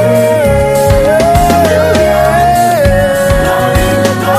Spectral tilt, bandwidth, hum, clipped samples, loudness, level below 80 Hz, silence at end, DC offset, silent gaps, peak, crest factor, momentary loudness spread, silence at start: -5.5 dB/octave; 16 kHz; none; under 0.1%; -9 LUFS; -20 dBFS; 0 s; under 0.1%; none; 0 dBFS; 8 dB; 2 LU; 0 s